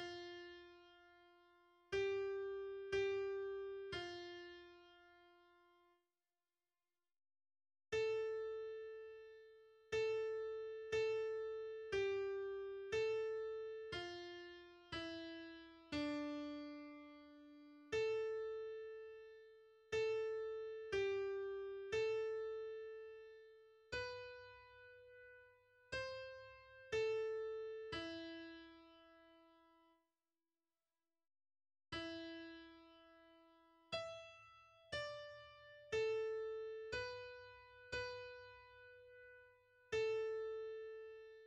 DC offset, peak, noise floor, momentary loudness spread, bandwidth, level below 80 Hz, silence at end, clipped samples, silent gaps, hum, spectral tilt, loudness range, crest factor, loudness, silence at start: under 0.1%; -30 dBFS; under -90 dBFS; 21 LU; 9.4 kHz; -74 dBFS; 0 s; under 0.1%; none; none; -4.5 dB/octave; 11 LU; 16 dB; -46 LUFS; 0 s